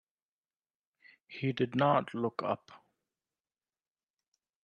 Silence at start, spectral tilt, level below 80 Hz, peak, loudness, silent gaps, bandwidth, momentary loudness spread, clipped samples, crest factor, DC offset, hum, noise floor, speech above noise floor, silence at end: 1.3 s; -8 dB/octave; -76 dBFS; -14 dBFS; -32 LUFS; none; 8.8 kHz; 10 LU; under 0.1%; 24 dB; under 0.1%; none; under -90 dBFS; over 58 dB; 1.85 s